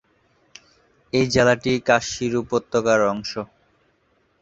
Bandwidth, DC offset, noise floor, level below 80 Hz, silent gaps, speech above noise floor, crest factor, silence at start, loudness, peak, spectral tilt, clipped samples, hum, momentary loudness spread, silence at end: 8.2 kHz; under 0.1%; -64 dBFS; -52 dBFS; none; 44 dB; 20 dB; 1.15 s; -20 LUFS; -2 dBFS; -4.5 dB/octave; under 0.1%; none; 12 LU; 0.95 s